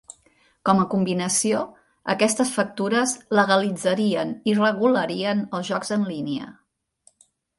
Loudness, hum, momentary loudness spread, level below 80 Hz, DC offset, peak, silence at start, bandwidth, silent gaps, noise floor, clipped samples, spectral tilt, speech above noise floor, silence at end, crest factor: -22 LUFS; none; 9 LU; -64 dBFS; under 0.1%; -4 dBFS; 0.65 s; 11.5 kHz; none; -62 dBFS; under 0.1%; -4 dB/octave; 40 dB; 1.05 s; 20 dB